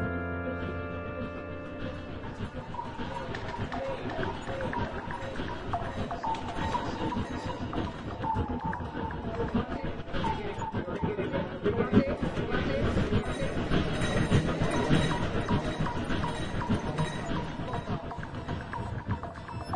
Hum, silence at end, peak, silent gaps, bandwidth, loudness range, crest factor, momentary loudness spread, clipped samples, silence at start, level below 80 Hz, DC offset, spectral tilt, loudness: none; 0 s; -10 dBFS; none; 11.5 kHz; 7 LU; 22 dB; 10 LU; under 0.1%; 0 s; -42 dBFS; 0.4%; -6.5 dB/octave; -32 LUFS